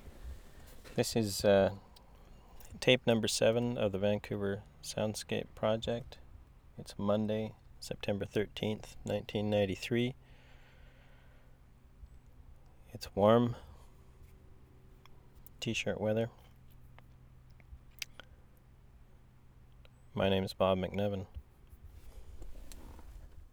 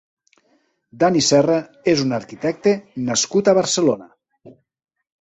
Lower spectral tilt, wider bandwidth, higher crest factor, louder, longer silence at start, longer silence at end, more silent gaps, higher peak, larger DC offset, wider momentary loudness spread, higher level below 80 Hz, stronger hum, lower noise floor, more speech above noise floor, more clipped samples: about the same, -5 dB/octave vs -4 dB/octave; first, over 20 kHz vs 8.4 kHz; first, 26 dB vs 18 dB; second, -34 LUFS vs -18 LUFS; second, 0 s vs 0.95 s; second, 0.05 s vs 0.7 s; neither; second, -10 dBFS vs -2 dBFS; neither; first, 25 LU vs 9 LU; about the same, -56 dBFS vs -60 dBFS; neither; second, -59 dBFS vs -63 dBFS; second, 26 dB vs 46 dB; neither